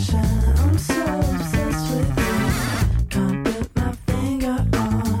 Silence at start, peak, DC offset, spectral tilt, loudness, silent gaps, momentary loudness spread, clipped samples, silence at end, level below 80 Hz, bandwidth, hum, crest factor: 0 s; -10 dBFS; under 0.1%; -6 dB/octave; -21 LUFS; none; 5 LU; under 0.1%; 0 s; -26 dBFS; 17 kHz; none; 10 dB